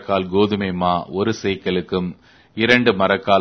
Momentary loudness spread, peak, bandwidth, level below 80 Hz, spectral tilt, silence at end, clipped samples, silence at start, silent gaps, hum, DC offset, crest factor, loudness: 10 LU; 0 dBFS; 6.6 kHz; -52 dBFS; -6 dB/octave; 0 s; under 0.1%; 0 s; none; none; under 0.1%; 18 dB; -19 LUFS